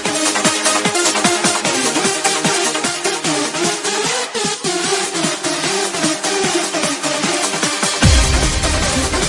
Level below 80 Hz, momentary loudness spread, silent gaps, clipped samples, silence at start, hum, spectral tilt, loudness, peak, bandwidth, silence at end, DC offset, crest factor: -28 dBFS; 4 LU; none; under 0.1%; 0 s; none; -2.5 dB/octave; -15 LUFS; 0 dBFS; 11.5 kHz; 0 s; under 0.1%; 16 dB